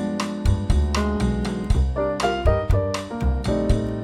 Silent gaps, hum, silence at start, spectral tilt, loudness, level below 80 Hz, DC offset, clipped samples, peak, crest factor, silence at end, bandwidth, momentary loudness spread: none; none; 0 s; -6.5 dB/octave; -23 LUFS; -24 dBFS; under 0.1%; under 0.1%; -4 dBFS; 16 dB; 0 s; 12 kHz; 4 LU